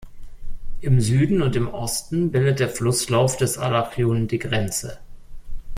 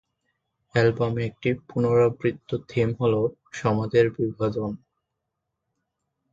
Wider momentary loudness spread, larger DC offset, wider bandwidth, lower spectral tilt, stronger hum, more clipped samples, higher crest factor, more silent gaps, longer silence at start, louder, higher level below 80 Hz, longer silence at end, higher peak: about the same, 7 LU vs 8 LU; neither; first, 16 kHz vs 7.6 kHz; second, -5.5 dB/octave vs -7.5 dB/octave; neither; neither; about the same, 16 dB vs 20 dB; neither; second, 0 s vs 0.75 s; first, -21 LUFS vs -24 LUFS; first, -36 dBFS vs -56 dBFS; second, 0 s vs 1.55 s; about the same, -6 dBFS vs -6 dBFS